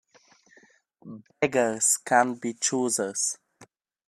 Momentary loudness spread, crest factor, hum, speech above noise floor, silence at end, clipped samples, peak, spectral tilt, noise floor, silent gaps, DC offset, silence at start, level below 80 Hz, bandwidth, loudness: 21 LU; 22 dB; none; 34 dB; 0.45 s; under 0.1%; -6 dBFS; -2.5 dB/octave; -60 dBFS; none; under 0.1%; 1.05 s; -74 dBFS; 15 kHz; -25 LUFS